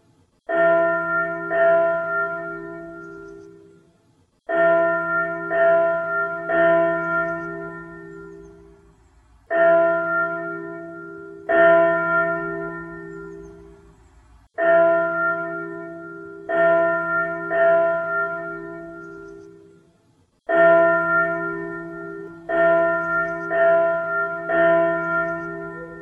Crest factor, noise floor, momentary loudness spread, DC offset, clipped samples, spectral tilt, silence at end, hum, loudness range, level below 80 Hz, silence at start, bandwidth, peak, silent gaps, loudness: 18 dB; -61 dBFS; 20 LU; under 0.1%; under 0.1%; -8 dB/octave; 0 s; none; 4 LU; -58 dBFS; 0.5 s; 3.6 kHz; -4 dBFS; none; -20 LUFS